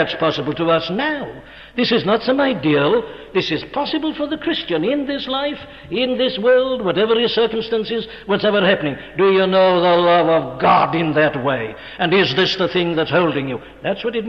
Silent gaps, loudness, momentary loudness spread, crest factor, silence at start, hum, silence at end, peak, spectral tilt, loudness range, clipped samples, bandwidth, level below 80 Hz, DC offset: none; -17 LUFS; 10 LU; 14 dB; 0 s; none; 0 s; -2 dBFS; -6.5 dB/octave; 4 LU; under 0.1%; 6.6 kHz; -50 dBFS; under 0.1%